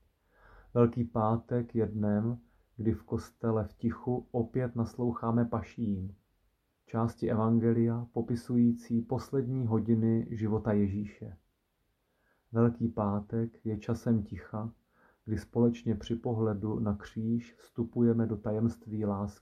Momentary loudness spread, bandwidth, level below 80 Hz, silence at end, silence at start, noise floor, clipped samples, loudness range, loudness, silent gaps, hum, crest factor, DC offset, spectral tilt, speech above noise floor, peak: 10 LU; 9.4 kHz; -58 dBFS; 0.1 s; 0.75 s; -77 dBFS; under 0.1%; 3 LU; -32 LUFS; none; none; 18 dB; under 0.1%; -9.5 dB/octave; 46 dB; -12 dBFS